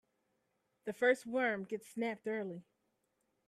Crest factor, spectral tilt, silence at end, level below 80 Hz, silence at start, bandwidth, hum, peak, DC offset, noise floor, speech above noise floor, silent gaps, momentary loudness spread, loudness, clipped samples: 22 dB; -5 dB/octave; 0.85 s; -86 dBFS; 0.85 s; 13.5 kHz; none; -18 dBFS; under 0.1%; -82 dBFS; 45 dB; none; 14 LU; -37 LUFS; under 0.1%